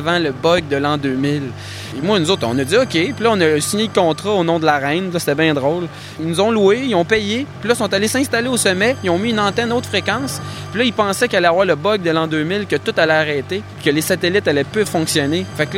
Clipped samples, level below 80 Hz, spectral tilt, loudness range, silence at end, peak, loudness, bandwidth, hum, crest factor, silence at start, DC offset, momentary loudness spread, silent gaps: under 0.1%; -52 dBFS; -4.5 dB/octave; 1 LU; 0 s; 0 dBFS; -17 LUFS; 16.5 kHz; none; 16 dB; 0 s; under 0.1%; 7 LU; none